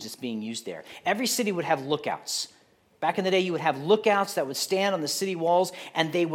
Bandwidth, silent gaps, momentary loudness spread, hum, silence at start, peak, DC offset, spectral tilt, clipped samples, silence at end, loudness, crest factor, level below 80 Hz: 17 kHz; none; 10 LU; none; 0 s; -8 dBFS; under 0.1%; -3.5 dB/octave; under 0.1%; 0 s; -27 LUFS; 20 dB; -80 dBFS